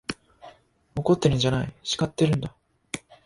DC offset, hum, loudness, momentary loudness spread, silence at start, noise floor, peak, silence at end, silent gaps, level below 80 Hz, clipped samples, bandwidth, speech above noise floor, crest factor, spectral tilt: under 0.1%; none; -25 LUFS; 15 LU; 0.1 s; -52 dBFS; -6 dBFS; 0.25 s; none; -50 dBFS; under 0.1%; 11.5 kHz; 29 dB; 20 dB; -5.5 dB/octave